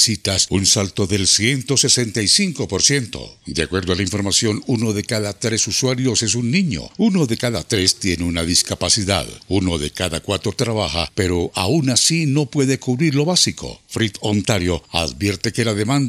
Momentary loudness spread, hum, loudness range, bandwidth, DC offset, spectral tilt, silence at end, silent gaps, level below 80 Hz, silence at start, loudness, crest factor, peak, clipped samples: 7 LU; none; 3 LU; 15.5 kHz; under 0.1%; -3.5 dB/octave; 0 s; none; -44 dBFS; 0 s; -18 LUFS; 18 dB; 0 dBFS; under 0.1%